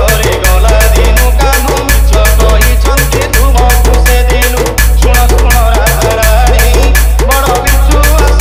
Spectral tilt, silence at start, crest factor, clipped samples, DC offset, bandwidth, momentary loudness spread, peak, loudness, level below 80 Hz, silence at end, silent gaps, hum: -4 dB/octave; 0 s; 6 dB; 1%; under 0.1%; 16 kHz; 2 LU; 0 dBFS; -8 LUFS; -8 dBFS; 0 s; none; none